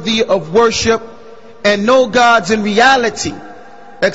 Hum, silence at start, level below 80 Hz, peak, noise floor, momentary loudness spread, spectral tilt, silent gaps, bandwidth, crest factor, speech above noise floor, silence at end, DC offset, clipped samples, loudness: none; 0 s; -44 dBFS; 0 dBFS; -38 dBFS; 9 LU; -3.5 dB/octave; none; 8 kHz; 14 dB; 26 dB; 0 s; 1%; under 0.1%; -12 LUFS